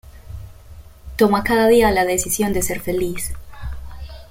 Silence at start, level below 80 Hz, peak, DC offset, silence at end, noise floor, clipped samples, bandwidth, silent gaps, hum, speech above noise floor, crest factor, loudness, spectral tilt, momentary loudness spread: 0.05 s; -36 dBFS; -2 dBFS; under 0.1%; 0.05 s; -41 dBFS; under 0.1%; 16.5 kHz; none; none; 23 dB; 18 dB; -18 LUFS; -4 dB/octave; 23 LU